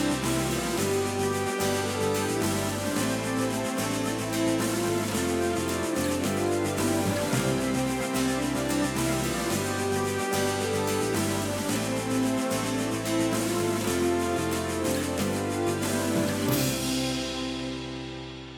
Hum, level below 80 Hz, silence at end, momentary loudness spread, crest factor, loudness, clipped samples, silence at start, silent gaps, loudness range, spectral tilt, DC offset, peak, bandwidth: none; -50 dBFS; 0 s; 2 LU; 14 dB; -27 LUFS; under 0.1%; 0 s; none; 1 LU; -4.5 dB/octave; under 0.1%; -12 dBFS; over 20 kHz